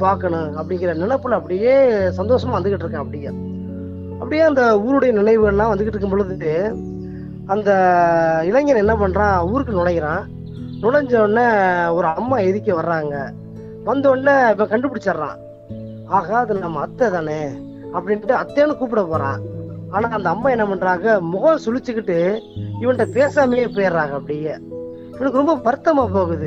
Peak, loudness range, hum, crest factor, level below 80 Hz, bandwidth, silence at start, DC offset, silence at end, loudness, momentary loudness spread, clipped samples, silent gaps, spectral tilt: -2 dBFS; 3 LU; none; 16 dB; -44 dBFS; 8 kHz; 0 s; under 0.1%; 0 s; -18 LUFS; 15 LU; under 0.1%; none; -7.5 dB/octave